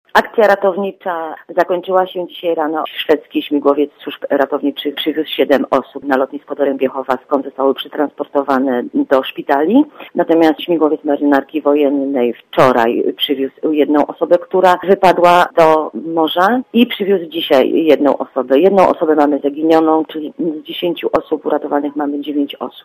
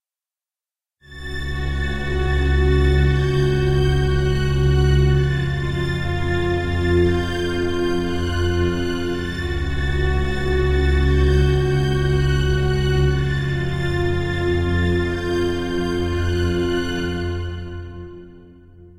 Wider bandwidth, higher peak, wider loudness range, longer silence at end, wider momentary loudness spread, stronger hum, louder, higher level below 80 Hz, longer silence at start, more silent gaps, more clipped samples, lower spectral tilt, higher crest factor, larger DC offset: first, 15.5 kHz vs 11.5 kHz; first, 0 dBFS vs -6 dBFS; about the same, 5 LU vs 4 LU; about the same, 0.05 s vs 0.1 s; about the same, 9 LU vs 8 LU; neither; first, -14 LUFS vs -20 LUFS; second, -56 dBFS vs -24 dBFS; second, 0.15 s vs 1.1 s; neither; first, 0.2% vs under 0.1%; about the same, -6 dB/octave vs -7 dB/octave; about the same, 14 dB vs 14 dB; neither